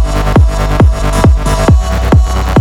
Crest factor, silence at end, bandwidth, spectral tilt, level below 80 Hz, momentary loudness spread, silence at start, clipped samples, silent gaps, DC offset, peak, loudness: 8 dB; 0 s; 15 kHz; -6.5 dB/octave; -10 dBFS; 1 LU; 0 s; under 0.1%; none; under 0.1%; 0 dBFS; -10 LUFS